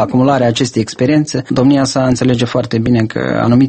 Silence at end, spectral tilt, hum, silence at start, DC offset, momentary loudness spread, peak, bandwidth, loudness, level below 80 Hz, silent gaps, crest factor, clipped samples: 0 s; -6 dB/octave; none; 0 s; under 0.1%; 4 LU; 0 dBFS; 8.8 kHz; -13 LUFS; -42 dBFS; none; 12 dB; under 0.1%